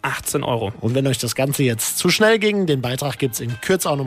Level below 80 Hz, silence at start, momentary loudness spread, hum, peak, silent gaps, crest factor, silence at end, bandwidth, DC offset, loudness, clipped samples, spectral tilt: -52 dBFS; 0.05 s; 8 LU; none; -6 dBFS; none; 14 dB; 0 s; 16 kHz; under 0.1%; -19 LUFS; under 0.1%; -4 dB/octave